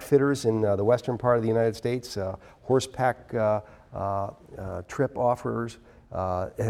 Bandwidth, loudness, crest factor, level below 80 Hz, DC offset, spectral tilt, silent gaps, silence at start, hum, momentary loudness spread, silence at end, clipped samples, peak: 16 kHz; -27 LUFS; 18 dB; -54 dBFS; under 0.1%; -6.5 dB/octave; none; 0 s; none; 14 LU; 0 s; under 0.1%; -8 dBFS